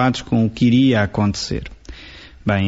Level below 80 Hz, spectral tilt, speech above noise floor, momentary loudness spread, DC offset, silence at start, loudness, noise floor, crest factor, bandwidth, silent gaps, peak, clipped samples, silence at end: -40 dBFS; -6.5 dB/octave; 23 dB; 23 LU; under 0.1%; 0 s; -18 LUFS; -40 dBFS; 14 dB; 8 kHz; none; -4 dBFS; under 0.1%; 0 s